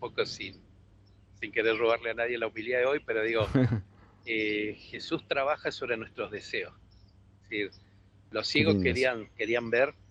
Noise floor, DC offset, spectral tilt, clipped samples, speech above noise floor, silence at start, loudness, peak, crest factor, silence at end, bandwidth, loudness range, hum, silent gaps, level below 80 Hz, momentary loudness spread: -58 dBFS; under 0.1%; -6 dB/octave; under 0.1%; 29 dB; 0 s; -30 LUFS; -10 dBFS; 20 dB; 0.2 s; 10 kHz; 5 LU; none; none; -56 dBFS; 12 LU